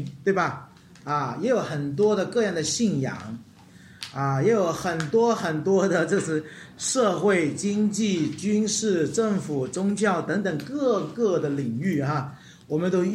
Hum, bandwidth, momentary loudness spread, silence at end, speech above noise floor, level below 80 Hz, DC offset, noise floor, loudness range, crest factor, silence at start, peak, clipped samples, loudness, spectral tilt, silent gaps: none; 14 kHz; 8 LU; 0 s; 25 dB; -64 dBFS; under 0.1%; -49 dBFS; 2 LU; 16 dB; 0 s; -10 dBFS; under 0.1%; -24 LUFS; -5 dB/octave; none